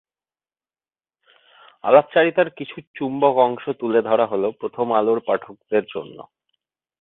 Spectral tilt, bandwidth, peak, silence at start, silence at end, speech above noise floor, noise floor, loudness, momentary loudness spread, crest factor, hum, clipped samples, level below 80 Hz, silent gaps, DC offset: -10 dB/octave; 4.1 kHz; -2 dBFS; 1.85 s; 0.8 s; over 70 dB; under -90 dBFS; -20 LUFS; 15 LU; 20 dB; none; under 0.1%; -68 dBFS; 2.87-2.94 s; under 0.1%